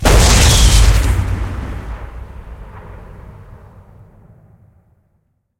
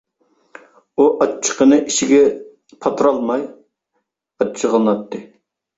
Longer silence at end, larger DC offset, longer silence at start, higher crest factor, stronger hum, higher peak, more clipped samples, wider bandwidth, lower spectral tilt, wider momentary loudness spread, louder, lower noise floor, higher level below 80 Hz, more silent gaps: first, 2.3 s vs 0.55 s; neither; second, 0 s vs 1 s; about the same, 16 dB vs 16 dB; neither; about the same, 0 dBFS vs -2 dBFS; neither; first, 17 kHz vs 8 kHz; about the same, -3.5 dB/octave vs -4 dB/octave; first, 26 LU vs 15 LU; first, -13 LUFS vs -16 LUFS; second, -63 dBFS vs -72 dBFS; first, -18 dBFS vs -60 dBFS; neither